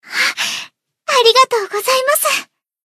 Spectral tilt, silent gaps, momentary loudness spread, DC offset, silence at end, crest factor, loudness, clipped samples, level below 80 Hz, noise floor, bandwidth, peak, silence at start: 1.5 dB/octave; none; 10 LU; under 0.1%; 0.45 s; 16 dB; -14 LUFS; under 0.1%; -70 dBFS; -35 dBFS; 14 kHz; 0 dBFS; 0.05 s